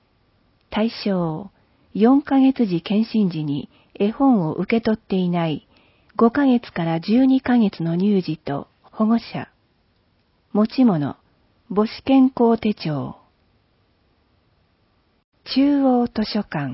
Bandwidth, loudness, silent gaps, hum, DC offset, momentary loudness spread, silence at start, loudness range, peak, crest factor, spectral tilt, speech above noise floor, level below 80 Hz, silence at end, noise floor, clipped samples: 5.8 kHz; -20 LUFS; 15.24-15.32 s; none; under 0.1%; 13 LU; 0.7 s; 4 LU; -4 dBFS; 16 dB; -11.5 dB/octave; 44 dB; -56 dBFS; 0 s; -63 dBFS; under 0.1%